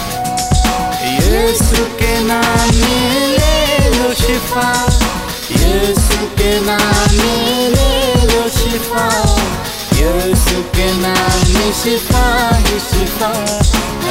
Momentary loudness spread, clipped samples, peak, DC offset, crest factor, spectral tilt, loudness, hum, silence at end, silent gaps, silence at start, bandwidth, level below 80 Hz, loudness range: 4 LU; under 0.1%; 0 dBFS; under 0.1%; 12 dB; -4 dB/octave; -13 LUFS; none; 0 s; none; 0 s; 16.5 kHz; -18 dBFS; 1 LU